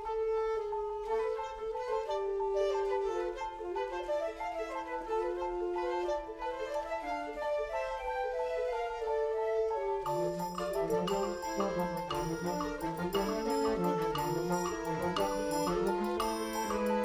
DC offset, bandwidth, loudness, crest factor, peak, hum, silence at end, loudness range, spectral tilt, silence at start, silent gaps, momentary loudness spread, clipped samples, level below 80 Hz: under 0.1%; 19.5 kHz; -34 LUFS; 16 dB; -18 dBFS; none; 0 s; 3 LU; -5 dB/octave; 0 s; none; 5 LU; under 0.1%; -54 dBFS